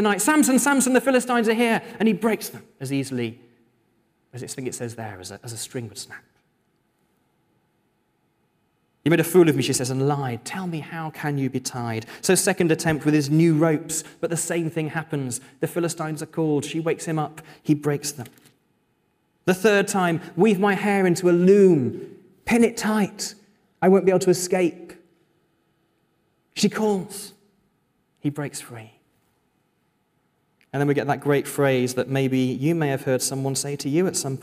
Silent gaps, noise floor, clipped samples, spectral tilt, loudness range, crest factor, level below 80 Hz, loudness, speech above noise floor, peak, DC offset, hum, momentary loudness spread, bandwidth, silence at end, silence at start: none; -69 dBFS; under 0.1%; -5 dB/octave; 15 LU; 18 dB; -64 dBFS; -22 LUFS; 47 dB; -6 dBFS; under 0.1%; none; 15 LU; 16 kHz; 0 s; 0 s